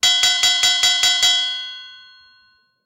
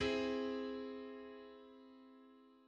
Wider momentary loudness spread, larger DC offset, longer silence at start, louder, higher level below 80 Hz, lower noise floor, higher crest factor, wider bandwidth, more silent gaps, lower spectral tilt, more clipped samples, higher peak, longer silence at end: second, 15 LU vs 23 LU; neither; about the same, 0.05 s vs 0 s; first, -14 LUFS vs -43 LUFS; first, -60 dBFS vs -68 dBFS; second, -57 dBFS vs -64 dBFS; about the same, 16 dB vs 18 dB; first, 17 kHz vs 8.8 kHz; neither; second, 3 dB/octave vs -5 dB/octave; neither; first, -4 dBFS vs -26 dBFS; first, 0.9 s vs 0.05 s